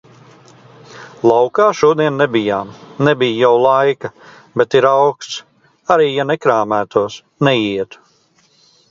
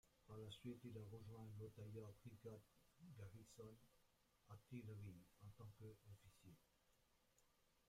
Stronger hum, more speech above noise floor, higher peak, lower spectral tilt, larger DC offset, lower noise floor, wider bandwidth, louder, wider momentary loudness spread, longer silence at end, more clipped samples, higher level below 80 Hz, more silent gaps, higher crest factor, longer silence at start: neither; first, 41 dB vs 21 dB; first, 0 dBFS vs -44 dBFS; about the same, -5.5 dB/octave vs -6.5 dB/octave; neither; second, -55 dBFS vs -81 dBFS; second, 7.6 kHz vs 16 kHz; first, -14 LUFS vs -61 LUFS; first, 14 LU vs 10 LU; first, 1.05 s vs 0.05 s; neither; first, -58 dBFS vs -80 dBFS; neither; about the same, 16 dB vs 18 dB; first, 0.9 s vs 0.05 s